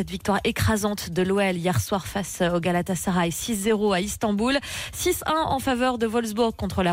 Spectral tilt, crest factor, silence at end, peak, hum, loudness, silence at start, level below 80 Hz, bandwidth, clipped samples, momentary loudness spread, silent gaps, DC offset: -4.5 dB/octave; 12 dB; 0 s; -12 dBFS; none; -24 LUFS; 0 s; -44 dBFS; 16 kHz; under 0.1%; 3 LU; none; under 0.1%